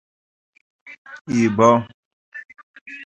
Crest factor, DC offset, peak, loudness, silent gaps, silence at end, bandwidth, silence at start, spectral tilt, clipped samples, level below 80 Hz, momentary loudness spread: 22 dB; under 0.1%; 0 dBFS; -17 LUFS; 0.98-1.05 s, 1.21-1.25 s, 1.94-2.32 s, 2.63-2.74 s, 2.81-2.86 s; 0 s; 8.2 kHz; 0.85 s; -6.5 dB/octave; under 0.1%; -60 dBFS; 24 LU